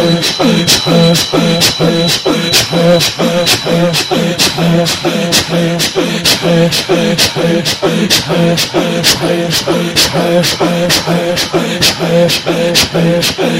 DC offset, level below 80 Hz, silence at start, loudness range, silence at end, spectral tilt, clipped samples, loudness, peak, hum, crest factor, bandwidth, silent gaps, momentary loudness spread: under 0.1%; -40 dBFS; 0 s; 2 LU; 0 s; -3.5 dB/octave; under 0.1%; -10 LUFS; 0 dBFS; none; 10 dB; 16.5 kHz; none; 4 LU